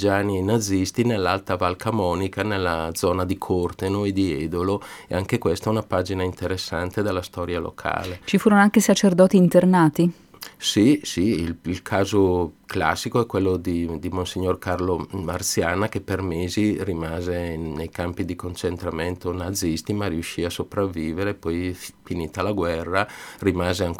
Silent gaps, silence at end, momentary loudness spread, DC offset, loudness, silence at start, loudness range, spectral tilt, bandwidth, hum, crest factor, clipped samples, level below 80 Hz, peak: none; 0 s; 11 LU; under 0.1%; -23 LUFS; 0 s; 8 LU; -5.5 dB/octave; 17.5 kHz; none; 20 dB; under 0.1%; -46 dBFS; -2 dBFS